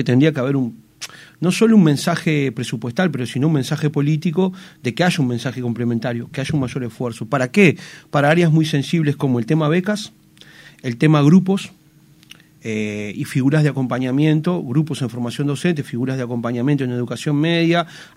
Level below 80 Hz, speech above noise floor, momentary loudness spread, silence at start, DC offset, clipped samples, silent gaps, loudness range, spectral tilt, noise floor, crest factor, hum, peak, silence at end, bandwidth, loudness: -58 dBFS; 32 dB; 12 LU; 0 s; under 0.1%; under 0.1%; none; 3 LU; -6.5 dB/octave; -50 dBFS; 18 dB; none; 0 dBFS; 0.1 s; 14.5 kHz; -18 LUFS